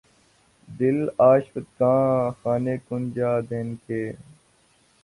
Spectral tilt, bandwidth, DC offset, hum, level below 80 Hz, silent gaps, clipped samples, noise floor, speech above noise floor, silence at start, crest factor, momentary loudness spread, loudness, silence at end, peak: -9.5 dB/octave; 11.5 kHz; under 0.1%; none; -60 dBFS; none; under 0.1%; -61 dBFS; 39 dB; 0.7 s; 18 dB; 13 LU; -23 LUFS; 0.8 s; -6 dBFS